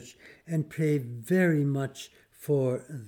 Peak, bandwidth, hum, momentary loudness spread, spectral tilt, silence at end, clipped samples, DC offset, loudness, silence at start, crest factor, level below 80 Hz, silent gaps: -12 dBFS; 19 kHz; none; 19 LU; -7.5 dB/octave; 0 s; under 0.1%; under 0.1%; -28 LUFS; 0 s; 16 dB; -74 dBFS; none